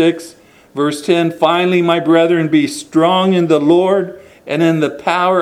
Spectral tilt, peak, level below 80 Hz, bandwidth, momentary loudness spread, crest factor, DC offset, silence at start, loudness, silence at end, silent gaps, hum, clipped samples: -6 dB/octave; 0 dBFS; -60 dBFS; 13.5 kHz; 8 LU; 14 dB; under 0.1%; 0 s; -13 LUFS; 0 s; none; none; under 0.1%